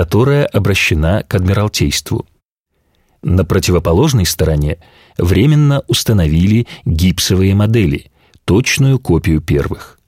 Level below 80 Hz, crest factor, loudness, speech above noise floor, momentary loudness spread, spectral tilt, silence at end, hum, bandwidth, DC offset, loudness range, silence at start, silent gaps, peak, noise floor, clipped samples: -26 dBFS; 12 dB; -13 LUFS; 53 dB; 8 LU; -5.5 dB/octave; 0.2 s; none; 16.5 kHz; under 0.1%; 3 LU; 0 s; 2.43-2.63 s; 0 dBFS; -65 dBFS; under 0.1%